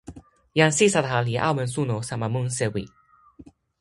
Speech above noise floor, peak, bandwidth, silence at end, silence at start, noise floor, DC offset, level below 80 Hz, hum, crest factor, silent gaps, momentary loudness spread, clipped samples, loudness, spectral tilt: 28 dB; -2 dBFS; 11.5 kHz; 0.4 s; 0.1 s; -51 dBFS; under 0.1%; -54 dBFS; none; 22 dB; none; 9 LU; under 0.1%; -23 LUFS; -4.5 dB/octave